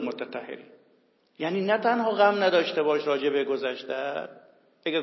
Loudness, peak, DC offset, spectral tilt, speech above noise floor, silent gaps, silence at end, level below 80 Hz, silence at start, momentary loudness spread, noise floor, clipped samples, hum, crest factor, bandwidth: -26 LUFS; -6 dBFS; under 0.1%; -6 dB/octave; 39 dB; none; 0 s; -88 dBFS; 0 s; 14 LU; -65 dBFS; under 0.1%; none; 20 dB; 6 kHz